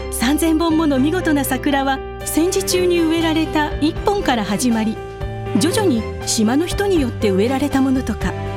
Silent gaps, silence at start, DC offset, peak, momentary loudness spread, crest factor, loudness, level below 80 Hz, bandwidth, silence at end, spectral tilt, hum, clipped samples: none; 0 s; under 0.1%; -2 dBFS; 5 LU; 16 dB; -18 LUFS; -32 dBFS; 17.5 kHz; 0 s; -4.5 dB/octave; none; under 0.1%